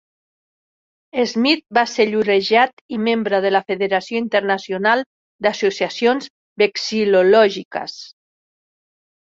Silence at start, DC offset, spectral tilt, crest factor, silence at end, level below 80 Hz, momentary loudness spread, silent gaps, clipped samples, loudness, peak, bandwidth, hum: 1.15 s; under 0.1%; -4.5 dB/octave; 18 dB; 1.2 s; -66 dBFS; 12 LU; 2.73-2.89 s, 5.06-5.39 s, 6.30-6.56 s, 7.65-7.71 s; under 0.1%; -18 LUFS; -2 dBFS; 7.6 kHz; none